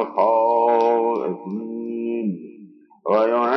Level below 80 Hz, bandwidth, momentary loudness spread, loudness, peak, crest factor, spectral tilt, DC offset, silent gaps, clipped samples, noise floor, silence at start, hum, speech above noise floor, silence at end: under -90 dBFS; 6 kHz; 12 LU; -21 LUFS; -6 dBFS; 14 dB; -8 dB/octave; under 0.1%; none; under 0.1%; -46 dBFS; 0 s; none; 26 dB; 0 s